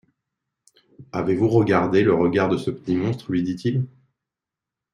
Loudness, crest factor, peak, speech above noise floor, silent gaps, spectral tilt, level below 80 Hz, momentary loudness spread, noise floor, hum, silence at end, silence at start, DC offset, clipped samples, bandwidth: -21 LUFS; 20 dB; -4 dBFS; 67 dB; none; -8 dB/octave; -58 dBFS; 9 LU; -87 dBFS; none; 1.05 s; 1 s; under 0.1%; under 0.1%; 11.5 kHz